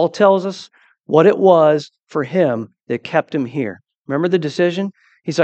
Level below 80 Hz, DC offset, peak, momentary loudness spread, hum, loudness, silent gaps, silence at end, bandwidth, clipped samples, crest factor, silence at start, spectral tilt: -68 dBFS; under 0.1%; 0 dBFS; 15 LU; none; -17 LUFS; 2.03-2.07 s, 3.97-4.05 s; 0 s; 8.6 kHz; under 0.1%; 16 dB; 0 s; -6.5 dB/octave